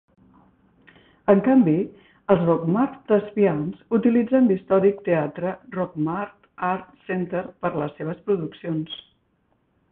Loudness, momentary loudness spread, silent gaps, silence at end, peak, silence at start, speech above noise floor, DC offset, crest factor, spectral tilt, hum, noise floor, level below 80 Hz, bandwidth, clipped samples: -23 LUFS; 12 LU; none; 0.95 s; -4 dBFS; 1.25 s; 46 dB; under 0.1%; 20 dB; -12 dB/octave; none; -67 dBFS; -60 dBFS; 3.9 kHz; under 0.1%